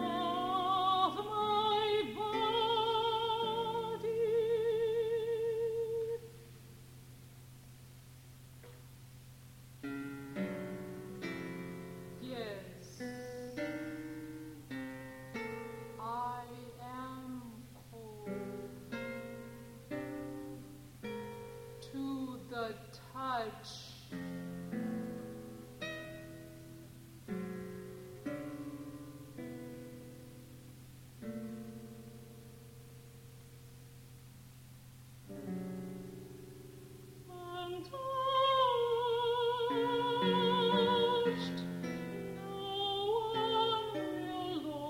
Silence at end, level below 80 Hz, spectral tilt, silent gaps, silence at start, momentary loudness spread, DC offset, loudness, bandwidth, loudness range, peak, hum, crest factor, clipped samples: 0 s; -66 dBFS; -5.5 dB/octave; none; 0 s; 23 LU; under 0.1%; -37 LUFS; 16.5 kHz; 17 LU; -20 dBFS; none; 20 dB; under 0.1%